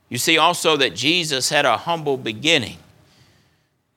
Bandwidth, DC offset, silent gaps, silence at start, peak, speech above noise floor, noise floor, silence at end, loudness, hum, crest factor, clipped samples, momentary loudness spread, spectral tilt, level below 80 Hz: 19 kHz; under 0.1%; none; 0.1 s; 0 dBFS; 45 dB; -64 dBFS; 1.2 s; -18 LUFS; none; 20 dB; under 0.1%; 8 LU; -2.5 dB/octave; -64 dBFS